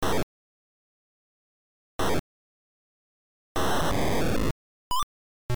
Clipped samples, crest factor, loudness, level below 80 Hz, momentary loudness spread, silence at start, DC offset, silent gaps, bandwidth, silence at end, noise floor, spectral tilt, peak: under 0.1%; 8 dB; -29 LUFS; -42 dBFS; 13 LU; 0 s; under 0.1%; 0.23-1.99 s, 2.19-3.55 s, 4.51-4.91 s, 5.03-5.49 s; over 20 kHz; 0 s; under -90 dBFS; -4.5 dB/octave; -20 dBFS